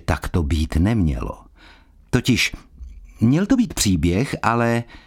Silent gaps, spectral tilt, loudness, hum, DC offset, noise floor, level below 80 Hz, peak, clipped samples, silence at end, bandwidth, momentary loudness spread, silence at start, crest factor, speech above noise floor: none; -5.5 dB/octave; -20 LUFS; none; under 0.1%; -48 dBFS; -30 dBFS; -2 dBFS; under 0.1%; 0.05 s; 17.5 kHz; 7 LU; 0.1 s; 18 dB; 29 dB